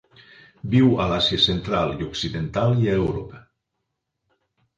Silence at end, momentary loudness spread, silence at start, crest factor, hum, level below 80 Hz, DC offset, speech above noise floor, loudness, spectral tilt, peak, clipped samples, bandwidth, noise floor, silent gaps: 1.4 s; 10 LU; 0.65 s; 18 dB; none; -44 dBFS; under 0.1%; 58 dB; -21 LUFS; -6.5 dB/octave; -6 dBFS; under 0.1%; 8.8 kHz; -79 dBFS; none